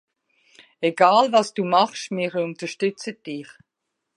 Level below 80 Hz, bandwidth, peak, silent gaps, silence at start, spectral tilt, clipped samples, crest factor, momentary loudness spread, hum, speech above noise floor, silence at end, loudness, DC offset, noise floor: -80 dBFS; 11.5 kHz; -2 dBFS; none; 0.8 s; -4.5 dB/octave; under 0.1%; 20 dB; 17 LU; none; 59 dB; 0.75 s; -21 LUFS; under 0.1%; -80 dBFS